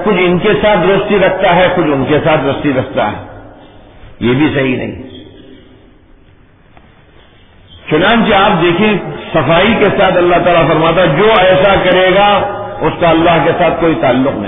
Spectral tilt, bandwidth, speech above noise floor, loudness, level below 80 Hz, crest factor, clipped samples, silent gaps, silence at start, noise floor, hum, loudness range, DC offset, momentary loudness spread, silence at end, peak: -9.5 dB/octave; 3.9 kHz; 33 dB; -10 LUFS; -34 dBFS; 10 dB; under 0.1%; none; 0 s; -43 dBFS; none; 9 LU; under 0.1%; 8 LU; 0 s; 0 dBFS